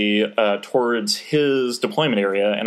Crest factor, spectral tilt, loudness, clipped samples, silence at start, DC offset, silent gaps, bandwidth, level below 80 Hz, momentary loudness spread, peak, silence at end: 14 dB; -4.5 dB/octave; -20 LUFS; under 0.1%; 0 s; under 0.1%; none; 15 kHz; -82 dBFS; 2 LU; -6 dBFS; 0 s